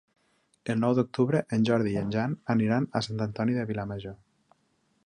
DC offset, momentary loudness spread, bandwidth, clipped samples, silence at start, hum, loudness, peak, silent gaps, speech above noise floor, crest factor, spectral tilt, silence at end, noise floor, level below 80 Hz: under 0.1%; 9 LU; 9.8 kHz; under 0.1%; 0.65 s; none; -28 LUFS; -10 dBFS; none; 44 dB; 18 dB; -7.5 dB/octave; 0.9 s; -71 dBFS; -60 dBFS